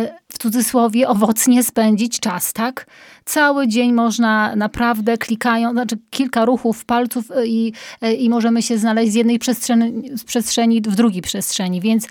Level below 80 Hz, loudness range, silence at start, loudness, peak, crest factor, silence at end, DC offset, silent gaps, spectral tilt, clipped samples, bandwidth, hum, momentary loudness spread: -52 dBFS; 2 LU; 0 s; -17 LUFS; -2 dBFS; 16 dB; 0 s; under 0.1%; none; -4 dB/octave; under 0.1%; 18.5 kHz; none; 7 LU